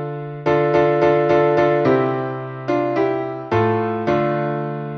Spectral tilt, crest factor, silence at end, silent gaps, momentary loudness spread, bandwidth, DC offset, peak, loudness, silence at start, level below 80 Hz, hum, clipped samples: -8.5 dB/octave; 14 dB; 0 s; none; 9 LU; 6.4 kHz; under 0.1%; -4 dBFS; -18 LUFS; 0 s; -52 dBFS; none; under 0.1%